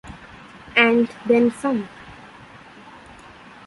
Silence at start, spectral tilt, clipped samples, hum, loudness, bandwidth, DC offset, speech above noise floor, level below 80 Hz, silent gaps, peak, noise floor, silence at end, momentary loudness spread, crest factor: 0.05 s; -5 dB/octave; under 0.1%; none; -19 LUFS; 11.5 kHz; under 0.1%; 26 dB; -54 dBFS; none; -2 dBFS; -44 dBFS; 1.55 s; 26 LU; 22 dB